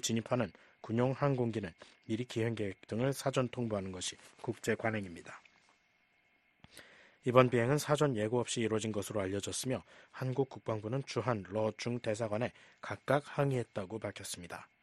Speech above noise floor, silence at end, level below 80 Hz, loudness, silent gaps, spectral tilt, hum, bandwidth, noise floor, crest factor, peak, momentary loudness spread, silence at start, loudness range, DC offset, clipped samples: 38 dB; 0.2 s; -68 dBFS; -35 LUFS; none; -5.5 dB/octave; none; 12.5 kHz; -73 dBFS; 26 dB; -10 dBFS; 13 LU; 0.05 s; 6 LU; under 0.1%; under 0.1%